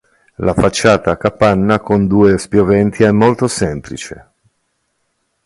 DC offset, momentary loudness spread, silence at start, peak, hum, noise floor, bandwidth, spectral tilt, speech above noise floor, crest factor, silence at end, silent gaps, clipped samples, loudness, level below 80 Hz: under 0.1%; 10 LU; 0.4 s; 0 dBFS; none; -66 dBFS; 11.5 kHz; -6 dB/octave; 54 dB; 14 dB; 1.3 s; none; under 0.1%; -13 LUFS; -36 dBFS